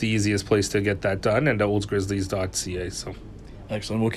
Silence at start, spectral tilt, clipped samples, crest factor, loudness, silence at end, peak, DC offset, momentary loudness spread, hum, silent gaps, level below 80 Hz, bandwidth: 0 s; -5 dB/octave; under 0.1%; 18 dB; -25 LUFS; 0 s; -8 dBFS; under 0.1%; 13 LU; none; none; -44 dBFS; 14 kHz